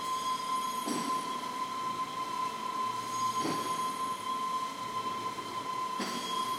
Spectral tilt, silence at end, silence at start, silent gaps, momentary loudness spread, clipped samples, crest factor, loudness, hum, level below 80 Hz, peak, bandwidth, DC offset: -2.5 dB/octave; 0 s; 0 s; none; 4 LU; under 0.1%; 14 dB; -34 LUFS; none; -74 dBFS; -22 dBFS; 16 kHz; under 0.1%